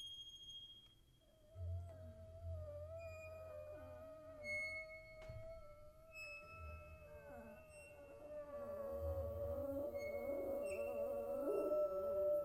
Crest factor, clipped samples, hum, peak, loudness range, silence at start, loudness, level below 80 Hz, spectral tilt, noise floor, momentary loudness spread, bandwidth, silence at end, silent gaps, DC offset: 18 dB; under 0.1%; none; -30 dBFS; 11 LU; 0 s; -47 LUFS; -62 dBFS; -6 dB/octave; -70 dBFS; 17 LU; 16 kHz; 0 s; none; under 0.1%